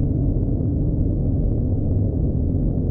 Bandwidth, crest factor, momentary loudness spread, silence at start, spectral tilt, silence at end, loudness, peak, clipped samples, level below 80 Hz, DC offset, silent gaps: 1.5 kHz; 10 dB; 1 LU; 0 s; -15 dB/octave; 0 s; -22 LUFS; -10 dBFS; under 0.1%; -24 dBFS; under 0.1%; none